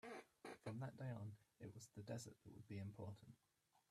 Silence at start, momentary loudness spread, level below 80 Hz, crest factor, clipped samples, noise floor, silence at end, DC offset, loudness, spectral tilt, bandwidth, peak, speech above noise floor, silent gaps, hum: 0.05 s; 9 LU; -84 dBFS; 18 dB; under 0.1%; -83 dBFS; 0.1 s; under 0.1%; -56 LUFS; -6 dB/octave; 13.5 kHz; -38 dBFS; 29 dB; none; none